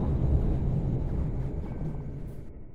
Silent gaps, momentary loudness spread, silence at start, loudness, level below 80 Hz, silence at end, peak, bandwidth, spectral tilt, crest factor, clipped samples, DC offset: none; 13 LU; 0 s; -31 LUFS; -32 dBFS; 0 s; -14 dBFS; 4.3 kHz; -11 dB/octave; 16 dB; under 0.1%; under 0.1%